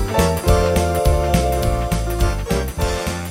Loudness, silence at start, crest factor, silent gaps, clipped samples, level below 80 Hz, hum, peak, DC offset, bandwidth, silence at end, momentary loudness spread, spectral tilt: -19 LUFS; 0 s; 16 dB; none; under 0.1%; -22 dBFS; none; -2 dBFS; under 0.1%; 16.5 kHz; 0 s; 5 LU; -5.5 dB/octave